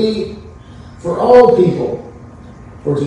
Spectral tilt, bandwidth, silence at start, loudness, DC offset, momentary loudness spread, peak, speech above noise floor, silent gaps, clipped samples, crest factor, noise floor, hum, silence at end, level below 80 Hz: -7.5 dB/octave; 9.2 kHz; 0 s; -12 LUFS; under 0.1%; 19 LU; 0 dBFS; 24 dB; none; under 0.1%; 14 dB; -35 dBFS; none; 0 s; -42 dBFS